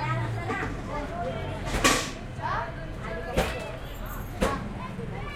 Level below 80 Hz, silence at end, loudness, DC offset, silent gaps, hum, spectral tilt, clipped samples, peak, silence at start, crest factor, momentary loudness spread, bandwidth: -38 dBFS; 0 s; -30 LUFS; under 0.1%; none; none; -4 dB/octave; under 0.1%; -6 dBFS; 0 s; 24 dB; 13 LU; 16.5 kHz